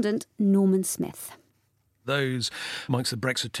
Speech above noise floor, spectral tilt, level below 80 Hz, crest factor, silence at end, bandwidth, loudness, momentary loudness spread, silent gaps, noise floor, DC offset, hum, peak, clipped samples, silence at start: 43 dB; -4.5 dB/octave; -68 dBFS; 18 dB; 0 s; 16 kHz; -26 LUFS; 13 LU; none; -70 dBFS; under 0.1%; none; -10 dBFS; under 0.1%; 0 s